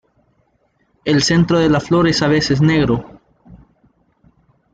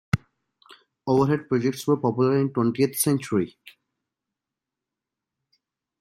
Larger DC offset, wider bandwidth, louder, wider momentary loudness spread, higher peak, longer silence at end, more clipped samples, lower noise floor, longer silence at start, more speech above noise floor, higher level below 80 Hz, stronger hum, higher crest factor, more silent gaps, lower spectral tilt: neither; second, 9.2 kHz vs 16.5 kHz; first, -15 LUFS vs -24 LUFS; second, 5 LU vs 8 LU; first, -2 dBFS vs -8 dBFS; second, 1.2 s vs 2.5 s; neither; second, -62 dBFS vs -87 dBFS; first, 1.05 s vs 0.15 s; second, 48 dB vs 64 dB; first, -42 dBFS vs -58 dBFS; neither; about the same, 14 dB vs 18 dB; neither; about the same, -5.5 dB/octave vs -6 dB/octave